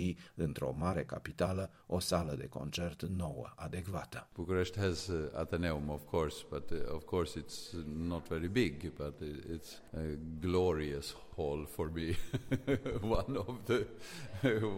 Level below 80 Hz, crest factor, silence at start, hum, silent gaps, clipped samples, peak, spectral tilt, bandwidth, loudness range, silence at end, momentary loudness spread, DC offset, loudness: -50 dBFS; 20 dB; 0 s; none; none; under 0.1%; -18 dBFS; -6 dB/octave; 16.5 kHz; 2 LU; 0 s; 10 LU; under 0.1%; -38 LUFS